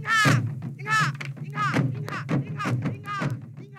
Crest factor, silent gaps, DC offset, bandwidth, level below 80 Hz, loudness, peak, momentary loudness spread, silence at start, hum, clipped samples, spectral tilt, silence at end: 18 dB; none; under 0.1%; 15.5 kHz; -62 dBFS; -26 LUFS; -8 dBFS; 12 LU; 0 s; none; under 0.1%; -5 dB/octave; 0 s